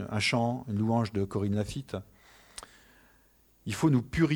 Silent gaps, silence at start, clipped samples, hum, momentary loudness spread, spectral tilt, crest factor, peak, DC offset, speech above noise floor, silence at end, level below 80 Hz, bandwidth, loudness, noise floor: none; 0 s; under 0.1%; none; 20 LU; -6 dB/octave; 18 dB; -14 dBFS; under 0.1%; 35 dB; 0 s; -54 dBFS; over 20 kHz; -30 LUFS; -64 dBFS